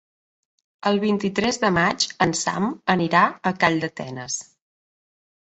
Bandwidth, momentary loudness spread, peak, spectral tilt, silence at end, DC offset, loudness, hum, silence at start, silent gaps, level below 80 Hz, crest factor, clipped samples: 8.2 kHz; 10 LU; -4 dBFS; -4 dB/octave; 1 s; under 0.1%; -22 LUFS; none; 0.85 s; none; -56 dBFS; 20 dB; under 0.1%